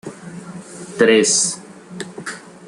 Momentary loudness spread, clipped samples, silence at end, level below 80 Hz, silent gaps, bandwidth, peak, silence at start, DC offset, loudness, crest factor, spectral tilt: 22 LU; under 0.1%; 0 s; -64 dBFS; none; 11.5 kHz; -2 dBFS; 0.05 s; under 0.1%; -14 LUFS; 18 dB; -2.5 dB/octave